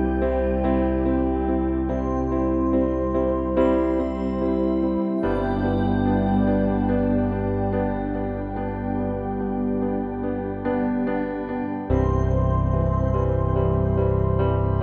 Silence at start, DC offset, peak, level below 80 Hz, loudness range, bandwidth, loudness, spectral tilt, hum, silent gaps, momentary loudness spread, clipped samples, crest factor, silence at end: 0 s; under 0.1%; -8 dBFS; -32 dBFS; 4 LU; 6.6 kHz; -23 LUFS; -10.5 dB/octave; none; none; 6 LU; under 0.1%; 14 dB; 0 s